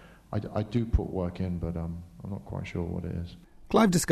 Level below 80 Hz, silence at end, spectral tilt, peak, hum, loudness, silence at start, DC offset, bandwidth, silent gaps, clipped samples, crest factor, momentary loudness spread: -40 dBFS; 0 s; -6 dB/octave; -8 dBFS; none; -31 LUFS; 0 s; under 0.1%; 13.5 kHz; none; under 0.1%; 22 dB; 15 LU